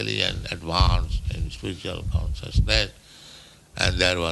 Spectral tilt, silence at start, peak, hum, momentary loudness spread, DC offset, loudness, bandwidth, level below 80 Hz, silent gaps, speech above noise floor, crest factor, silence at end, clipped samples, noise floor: -4.5 dB/octave; 0 s; -2 dBFS; none; 13 LU; under 0.1%; -25 LUFS; 12 kHz; -28 dBFS; none; 24 dB; 22 dB; 0 s; under 0.1%; -48 dBFS